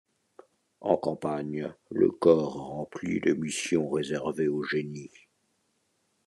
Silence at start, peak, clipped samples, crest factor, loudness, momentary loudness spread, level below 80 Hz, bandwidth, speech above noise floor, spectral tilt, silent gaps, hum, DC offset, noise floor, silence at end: 0.8 s; -8 dBFS; under 0.1%; 22 dB; -28 LUFS; 14 LU; -66 dBFS; 12 kHz; 46 dB; -5.5 dB/octave; none; none; under 0.1%; -74 dBFS; 1.2 s